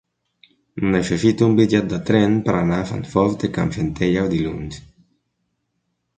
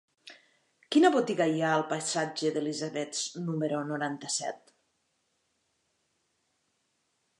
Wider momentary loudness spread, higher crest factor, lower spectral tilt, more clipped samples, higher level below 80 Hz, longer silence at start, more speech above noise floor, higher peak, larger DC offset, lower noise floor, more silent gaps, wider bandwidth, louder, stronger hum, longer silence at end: about the same, 10 LU vs 9 LU; about the same, 18 dB vs 20 dB; first, -7 dB/octave vs -4 dB/octave; neither; first, -44 dBFS vs -86 dBFS; first, 0.75 s vs 0.25 s; first, 55 dB vs 48 dB; first, -2 dBFS vs -12 dBFS; neither; about the same, -73 dBFS vs -76 dBFS; neither; second, 9.4 kHz vs 11 kHz; first, -19 LUFS vs -29 LUFS; neither; second, 1.4 s vs 2.85 s